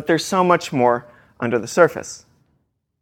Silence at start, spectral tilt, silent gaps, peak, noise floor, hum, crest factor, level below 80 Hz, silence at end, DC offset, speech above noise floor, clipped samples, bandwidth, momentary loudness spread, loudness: 0 s; -5 dB/octave; none; 0 dBFS; -68 dBFS; none; 20 dB; -60 dBFS; 0.85 s; under 0.1%; 50 dB; under 0.1%; 16.5 kHz; 15 LU; -19 LUFS